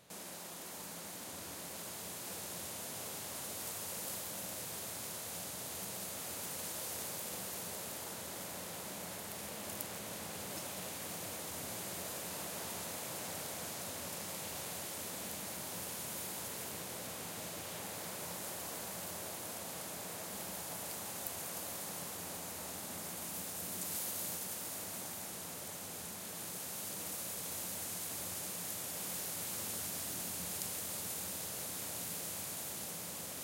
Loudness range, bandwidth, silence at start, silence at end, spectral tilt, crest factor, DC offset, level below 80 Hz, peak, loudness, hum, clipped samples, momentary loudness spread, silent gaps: 3 LU; 16.5 kHz; 0 s; 0 s; -1.5 dB/octave; 28 dB; under 0.1%; -72 dBFS; -16 dBFS; -41 LUFS; none; under 0.1%; 5 LU; none